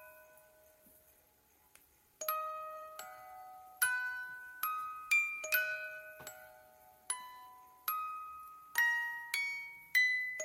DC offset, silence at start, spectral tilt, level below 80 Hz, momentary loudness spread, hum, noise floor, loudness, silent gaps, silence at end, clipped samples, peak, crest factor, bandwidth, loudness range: under 0.1%; 0 s; 2 dB/octave; -82 dBFS; 21 LU; none; -69 dBFS; -35 LUFS; none; 0 s; under 0.1%; -18 dBFS; 22 dB; 16 kHz; 10 LU